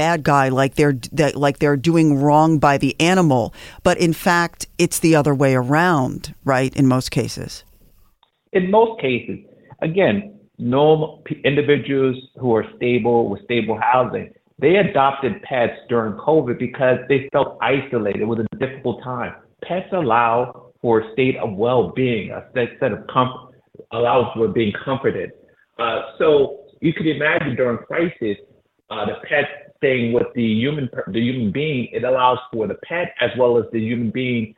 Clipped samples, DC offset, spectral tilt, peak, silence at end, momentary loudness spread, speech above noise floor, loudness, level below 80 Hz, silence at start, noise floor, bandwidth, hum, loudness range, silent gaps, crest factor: under 0.1%; under 0.1%; -6 dB/octave; -2 dBFS; 0.05 s; 10 LU; 40 dB; -19 LUFS; -50 dBFS; 0 s; -59 dBFS; 16.5 kHz; none; 5 LU; none; 16 dB